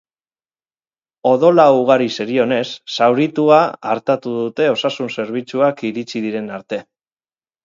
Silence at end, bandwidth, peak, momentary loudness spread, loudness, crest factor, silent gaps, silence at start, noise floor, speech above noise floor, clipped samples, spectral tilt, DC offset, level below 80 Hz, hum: 0.8 s; 7.6 kHz; 0 dBFS; 12 LU; -16 LUFS; 16 dB; none; 1.25 s; under -90 dBFS; over 74 dB; under 0.1%; -6 dB/octave; under 0.1%; -68 dBFS; none